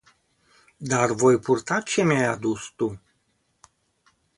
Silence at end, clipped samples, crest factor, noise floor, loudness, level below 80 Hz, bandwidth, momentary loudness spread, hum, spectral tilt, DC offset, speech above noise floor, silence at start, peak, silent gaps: 1.4 s; under 0.1%; 20 dB; -70 dBFS; -23 LUFS; -60 dBFS; 11.5 kHz; 10 LU; none; -5 dB/octave; under 0.1%; 48 dB; 0.8 s; -6 dBFS; none